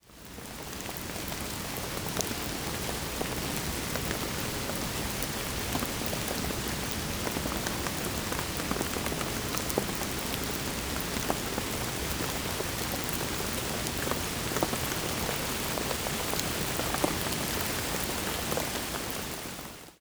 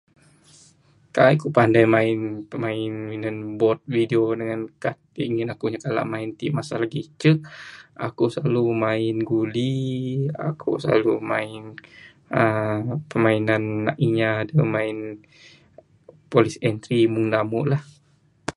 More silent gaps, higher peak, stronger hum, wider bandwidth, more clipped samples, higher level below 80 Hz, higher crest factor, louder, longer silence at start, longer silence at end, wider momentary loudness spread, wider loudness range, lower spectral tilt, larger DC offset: neither; second, -6 dBFS vs -2 dBFS; neither; first, over 20 kHz vs 11.5 kHz; neither; first, -44 dBFS vs -60 dBFS; first, 28 dB vs 22 dB; second, -31 LUFS vs -23 LUFS; second, 0.05 s vs 1.15 s; about the same, 0.05 s vs 0.05 s; second, 4 LU vs 11 LU; about the same, 2 LU vs 4 LU; second, -3 dB/octave vs -7.5 dB/octave; neither